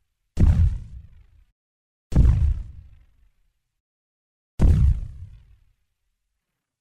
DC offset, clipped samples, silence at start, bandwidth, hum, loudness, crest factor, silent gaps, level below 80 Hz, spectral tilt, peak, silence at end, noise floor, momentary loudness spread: under 0.1%; under 0.1%; 0.35 s; 8.4 kHz; none; -22 LUFS; 18 dB; 1.52-2.10 s, 3.80-4.58 s; -26 dBFS; -9 dB/octave; -4 dBFS; 1.55 s; -80 dBFS; 22 LU